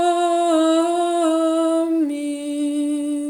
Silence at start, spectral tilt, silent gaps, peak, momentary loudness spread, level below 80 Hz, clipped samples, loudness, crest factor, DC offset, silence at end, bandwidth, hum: 0 s; -2.5 dB/octave; none; -6 dBFS; 6 LU; -74 dBFS; under 0.1%; -19 LUFS; 12 dB; under 0.1%; 0 s; 13 kHz; none